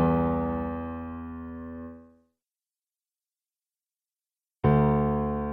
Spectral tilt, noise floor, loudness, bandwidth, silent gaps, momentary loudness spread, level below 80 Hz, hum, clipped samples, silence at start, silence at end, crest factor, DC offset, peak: -12 dB/octave; under -90 dBFS; -27 LUFS; 3.9 kHz; none; 17 LU; -42 dBFS; none; under 0.1%; 0 s; 0 s; 20 dB; under 0.1%; -10 dBFS